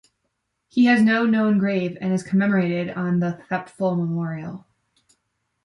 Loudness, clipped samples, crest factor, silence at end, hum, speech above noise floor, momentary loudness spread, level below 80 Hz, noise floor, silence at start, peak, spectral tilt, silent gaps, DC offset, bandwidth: -21 LUFS; under 0.1%; 16 dB; 1.05 s; none; 55 dB; 12 LU; -66 dBFS; -75 dBFS; 0.75 s; -6 dBFS; -7.5 dB/octave; none; under 0.1%; 11 kHz